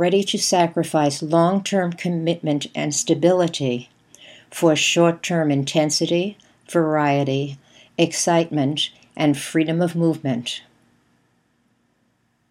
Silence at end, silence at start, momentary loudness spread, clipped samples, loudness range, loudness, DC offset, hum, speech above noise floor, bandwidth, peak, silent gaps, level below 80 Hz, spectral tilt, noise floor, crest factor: 1.9 s; 0 s; 8 LU; under 0.1%; 4 LU; -20 LUFS; under 0.1%; none; 46 dB; 15.5 kHz; -2 dBFS; none; -70 dBFS; -4.5 dB/octave; -66 dBFS; 18 dB